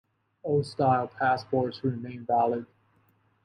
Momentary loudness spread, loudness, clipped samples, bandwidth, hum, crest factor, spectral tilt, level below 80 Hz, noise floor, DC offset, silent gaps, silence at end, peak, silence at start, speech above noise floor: 9 LU; -28 LUFS; under 0.1%; 10.5 kHz; none; 18 dB; -7.5 dB/octave; -68 dBFS; -67 dBFS; under 0.1%; none; 0.8 s; -10 dBFS; 0.45 s; 40 dB